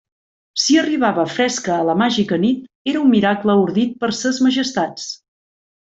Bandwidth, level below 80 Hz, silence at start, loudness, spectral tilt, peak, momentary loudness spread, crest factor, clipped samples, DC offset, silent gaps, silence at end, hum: 8 kHz; -58 dBFS; 0.55 s; -17 LUFS; -4.5 dB/octave; -2 dBFS; 9 LU; 16 dB; under 0.1%; under 0.1%; 2.75-2.85 s; 0.7 s; none